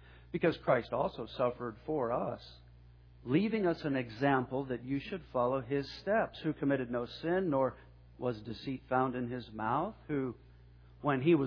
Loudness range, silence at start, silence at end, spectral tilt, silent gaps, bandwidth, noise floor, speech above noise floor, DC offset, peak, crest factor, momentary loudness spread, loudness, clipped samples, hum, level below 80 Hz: 2 LU; 0.1 s; 0 s; -5.5 dB/octave; none; 5.4 kHz; -57 dBFS; 24 dB; under 0.1%; -14 dBFS; 20 dB; 10 LU; -35 LUFS; under 0.1%; none; -60 dBFS